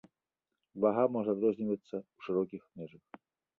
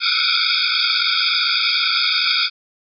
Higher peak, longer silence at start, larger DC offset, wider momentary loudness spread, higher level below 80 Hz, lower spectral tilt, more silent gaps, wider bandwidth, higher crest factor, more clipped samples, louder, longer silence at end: second, -14 dBFS vs -6 dBFS; first, 0.75 s vs 0 s; neither; first, 19 LU vs 1 LU; first, -78 dBFS vs under -90 dBFS; first, -9.5 dB/octave vs 7.5 dB/octave; neither; second, 4.5 kHz vs 5.6 kHz; first, 20 dB vs 14 dB; neither; second, -33 LUFS vs -15 LUFS; first, 0.7 s vs 0.5 s